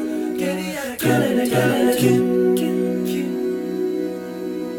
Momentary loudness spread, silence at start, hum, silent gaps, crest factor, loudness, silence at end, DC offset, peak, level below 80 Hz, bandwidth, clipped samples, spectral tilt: 9 LU; 0 s; none; none; 16 dB; -20 LUFS; 0 s; under 0.1%; -4 dBFS; -56 dBFS; 18 kHz; under 0.1%; -5.5 dB/octave